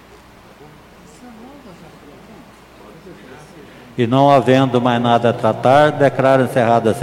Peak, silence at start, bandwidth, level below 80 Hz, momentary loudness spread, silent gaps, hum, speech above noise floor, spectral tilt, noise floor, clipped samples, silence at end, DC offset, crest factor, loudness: 0 dBFS; 1.25 s; 15.5 kHz; -52 dBFS; 5 LU; none; none; 27 dB; -7 dB/octave; -43 dBFS; under 0.1%; 0 s; under 0.1%; 16 dB; -14 LUFS